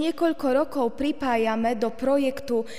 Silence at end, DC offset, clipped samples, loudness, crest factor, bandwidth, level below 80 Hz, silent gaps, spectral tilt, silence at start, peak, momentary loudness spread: 0 s; 1%; under 0.1%; -25 LUFS; 14 dB; 15.5 kHz; -54 dBFS; none; -5 dB/octave; 0 s; -10 dBFS; 3 LU